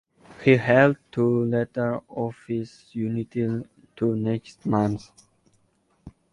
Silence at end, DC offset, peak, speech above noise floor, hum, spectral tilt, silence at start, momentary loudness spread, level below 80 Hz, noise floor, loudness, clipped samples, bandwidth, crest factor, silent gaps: 0.25 s; under 0.1%; -4 dBFS; 43 dB; none; -8 dB/octave; 0.3 s; 13 LU; -58 dBFS; -66 dBFS; -24 LUFS; under 0.1%; 11 kHz; 20 dB; none